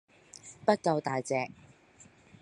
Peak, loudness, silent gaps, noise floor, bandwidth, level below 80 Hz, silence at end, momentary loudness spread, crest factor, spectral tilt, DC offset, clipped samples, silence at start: -10 dBFS; -31 LUFS; none; -59 dBFS; 11.5 kHz; -74 dBFS; 0.9 s; 21 LU; 24 dB; -5.5 dB/octave; under 0.1%; under 0.1%; 0.45 s